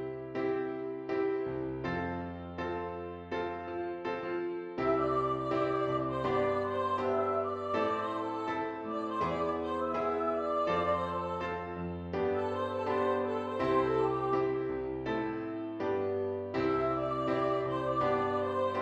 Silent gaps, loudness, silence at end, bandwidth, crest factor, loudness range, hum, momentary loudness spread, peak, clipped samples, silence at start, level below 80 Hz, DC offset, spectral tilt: none; -33 LUFS; 0 s; 8 kHz; 16 dB; 4 LU; none; 7 LU; -18 dBFS; under 0.1%; 0 s; -60 dBFS; under 0.1%; -7.5 dB/octave